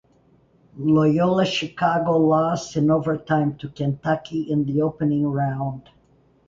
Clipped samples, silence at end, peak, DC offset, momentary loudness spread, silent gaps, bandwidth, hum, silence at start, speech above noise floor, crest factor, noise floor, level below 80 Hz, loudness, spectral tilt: under 0.1%; 0.7 s; -6 dBFS; under 0.1%; 8 LU; none; 7.6 kHz; none; 0.75 s; 37 dB; 14 dB; -58 dBFS; -56 dBFS; -22 LUFS; -7 dB/octave